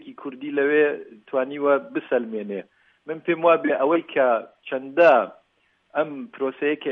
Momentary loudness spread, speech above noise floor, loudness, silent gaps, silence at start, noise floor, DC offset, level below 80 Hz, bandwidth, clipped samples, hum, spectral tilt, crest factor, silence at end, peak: 15 LU; 44 dB; -22 LUFS; none; 0.05 s; -66 dBFS; under 0.1%; -78 dBFS; 6 kHz; under 0.1%; none; -7.5 dB/octave; 18 dB; 0 s; -4 dBFS